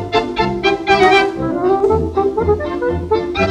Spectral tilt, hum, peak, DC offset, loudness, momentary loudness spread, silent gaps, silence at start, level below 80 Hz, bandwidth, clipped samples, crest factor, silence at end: -6 dB/octave; none; 0 dBFS; under 0.1%; -15 LUFS; 7 LU; none; 0 s; -36 dBFS; 10.5 kHz; under 0.1%; 14 dB; 0 s